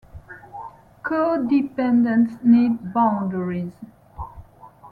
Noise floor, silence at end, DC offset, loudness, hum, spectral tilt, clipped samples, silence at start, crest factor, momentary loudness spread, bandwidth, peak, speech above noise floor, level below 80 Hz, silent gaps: -46 dBFS; 0 s; under 0.1%; -20 LUFS; none; -9.5 dB/octave; under 0.1%; 0.15 s; 16 dB; 22 LU; 4.7 kHz; -6 dBFS; 27 dB; -52 dBFS; none